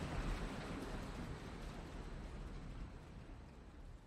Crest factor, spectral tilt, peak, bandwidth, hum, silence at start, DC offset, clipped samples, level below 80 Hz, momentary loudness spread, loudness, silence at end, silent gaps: 16 dB; -6 dB/octave; -32 dBFS; 13.5 kHz; none; 0 s; under 0.1%; under 0.1%; -50 dBFS; 12 LU; -50 LUFS; 0 s; none